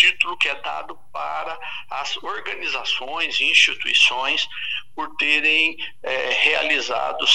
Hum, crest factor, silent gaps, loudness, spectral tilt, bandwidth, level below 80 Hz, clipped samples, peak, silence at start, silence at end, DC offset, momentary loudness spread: none; 20 dB; none; -19 LUFS; 0.5 dB/octave; 12 kHz; -62 dBFS; under 0.1%; -2 dBFS; 0 s; 0 s; 2%; 14 LU